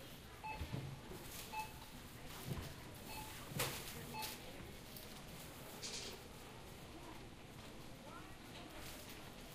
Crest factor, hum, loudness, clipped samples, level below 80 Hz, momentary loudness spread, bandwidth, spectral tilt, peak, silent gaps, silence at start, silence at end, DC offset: 26 dB; none; -50 LUFS; under 0.1%; -60 dBFS; 8 LU; 15.5 kHz; -3.5 dB/octave; -24 dBFS; none; 0 s; 0 s; under 0.1%